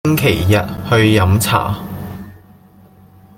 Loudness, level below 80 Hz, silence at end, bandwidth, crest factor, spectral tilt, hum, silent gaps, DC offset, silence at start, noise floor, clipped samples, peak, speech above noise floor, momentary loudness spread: -14 LUFS; -40 dBFS; 1 s; 17 kHz; 14 dB; -5.5 dB/octave; none; none; under 0.1%; 0.05 s; -44 dBFS; under 0.1%; 0 dBFS; 31 dB; 17 LU